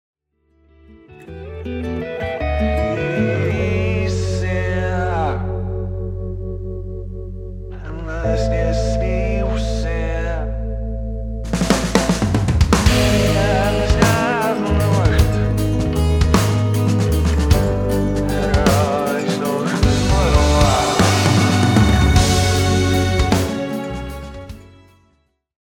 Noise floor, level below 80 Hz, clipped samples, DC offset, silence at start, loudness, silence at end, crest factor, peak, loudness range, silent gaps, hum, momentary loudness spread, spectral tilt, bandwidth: -62 dBFS; -24 dBFS; under 0.1%; under 0.1%; 0.9 s; -18 LUFS; 1 s; 18 dB; 0 dBFS; 8 LU; none; none; 14 LU; -5.5 dB/octave; 19 kHz